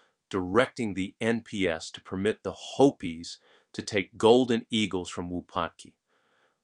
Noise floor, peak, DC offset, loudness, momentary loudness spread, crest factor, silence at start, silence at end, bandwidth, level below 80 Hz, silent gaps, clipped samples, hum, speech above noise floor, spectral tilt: -69 dBFS; -6 dBFS; under 0.1%; -28 LUFS; 14 LU; 22 dB; 0.3 s; 0.8 s; 11 kHz; -62 dBFS; none; under 0.1%; none; 41 dB; -5 dB/octave